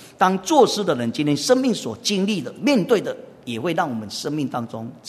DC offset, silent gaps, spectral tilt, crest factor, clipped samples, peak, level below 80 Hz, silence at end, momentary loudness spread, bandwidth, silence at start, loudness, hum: under 0.1%; none; -4.5 dB/octave; 20 dB; under 0.1%; -2 dBFS; -66 dBFS; 0 s; 11 LU; 13.5 kHz; 0 s; -21 LUFS; none